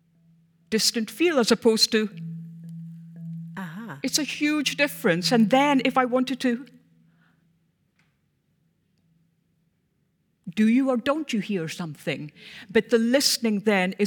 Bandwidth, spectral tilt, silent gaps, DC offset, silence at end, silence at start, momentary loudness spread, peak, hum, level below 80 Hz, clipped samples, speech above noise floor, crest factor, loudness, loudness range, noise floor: 19.5 kHz; -4 dB/octave; none; under 0.1%; 0 s; 0.7 s; 19 LU; -6 dBFS; none; -70 dBFS; under 0.1%; 48 dB; 20 dB; -23 LUFS; 7 LU; -70 dBFS